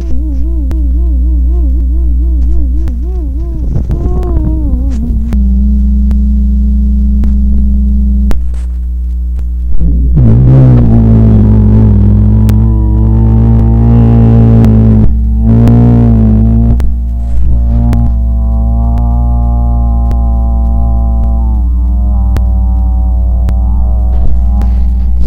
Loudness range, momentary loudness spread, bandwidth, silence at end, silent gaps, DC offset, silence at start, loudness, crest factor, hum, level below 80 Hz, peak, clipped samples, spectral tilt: 6 LU; 9 LU; 2.4 kHz; 0 s; none; under 0.1%; 0 s; -9 LUFS; 6 dB; none; -8 dBFS; 0 dBFS; 3%; -11 dB/octave